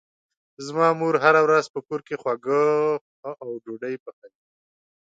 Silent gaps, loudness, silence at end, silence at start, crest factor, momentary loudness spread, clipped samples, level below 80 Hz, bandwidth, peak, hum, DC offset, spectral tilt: 1.70-1.74 s, 3.01-3.23 s, 4.00-4.06 s, 4.13-4.22 s; -22 LUFS; 0.8 s; 0.6 s; 20 dB; 17 LU; under 0.1%; -76 dBFS; 7.8 kHz; -4 dBFS; none; under 0.1%; -5.5 dB/octave